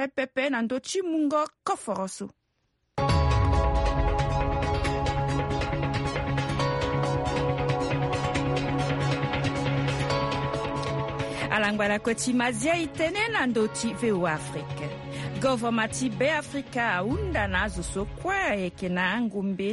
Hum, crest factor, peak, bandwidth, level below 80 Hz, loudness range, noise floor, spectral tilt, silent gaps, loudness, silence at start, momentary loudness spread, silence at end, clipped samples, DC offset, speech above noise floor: none; 16 dB; -10 dBFS; 11.5 kHz; -36 dBFS; 2 LU; -74 dBFS; -5.5 dB/octave; none; -27 LUFS; 0 s; 6 LU; 0 s; under 0.1%; under 0.1%; 47 dB